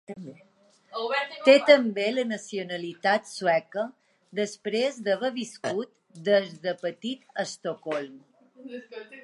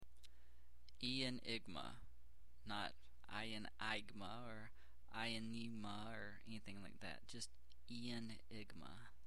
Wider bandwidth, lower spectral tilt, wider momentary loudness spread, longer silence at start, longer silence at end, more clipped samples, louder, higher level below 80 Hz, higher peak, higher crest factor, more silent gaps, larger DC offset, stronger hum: second, 11.5 kHz vs 15.5 kHz; about the same, -4 dB/octave vs -4 dB/octave; first, 21 LU vs 18 LU; about the same, 0.1 s vs 0 s; about the same, 0.05 s vs 0 s; neither; first, -26 LUFS vs -50 LUFS; second, -84 dBFS vs -68 dBFS; first, -2 dBFS vs -30 dBFS; about the same, 24 dB vs 22 dB; neither; second, under 0.1% vs 0.3%; neither